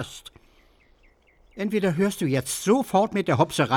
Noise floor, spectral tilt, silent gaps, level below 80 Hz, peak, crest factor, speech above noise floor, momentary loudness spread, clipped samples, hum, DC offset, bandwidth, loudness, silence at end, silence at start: -59 dBFS; -5.5 dB/octave; none; -58 dBFS; -6 dBFS; 20 dB; 36 dB; 10 LU; under 0.1%; none; under 0.1%; 18 kHz; -24 LUFS; 0 s; 0 s